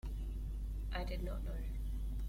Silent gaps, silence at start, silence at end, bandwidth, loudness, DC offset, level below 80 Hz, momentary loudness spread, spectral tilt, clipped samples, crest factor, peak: none; 0.05 s; 0 s; 15.5 kHz; -44 LUFS; under 0.1%; -40 dBFS; 3 LU; -6.5 dB/octave; under 0.1%; 12 dB; -28 dBFS